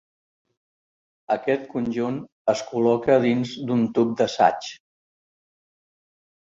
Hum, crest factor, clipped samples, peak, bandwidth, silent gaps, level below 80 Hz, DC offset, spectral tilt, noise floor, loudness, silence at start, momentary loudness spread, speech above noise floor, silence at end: none; 20 dB; under 0.1%; -4 dBFS; 7.6 kHz; 2.32-2.45 s; -64 dBFS; under 0.1%; -6 dB/octave; under -90 dBFS; -23 LUFS; 1.3 s; 8 LU; over 68 dB; 1.75 s